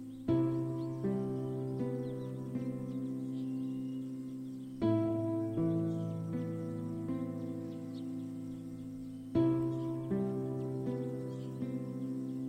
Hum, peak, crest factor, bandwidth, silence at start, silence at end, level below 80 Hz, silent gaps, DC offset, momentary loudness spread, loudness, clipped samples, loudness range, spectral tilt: none; -20 dBFS; 16 dB; 9.6 kHz; 0 s; 0 s; -64 dBFS; none; under 0.1%; 10 LU; -37 LUFS; under 0.1%; 3 LU; -9.5 dB/octave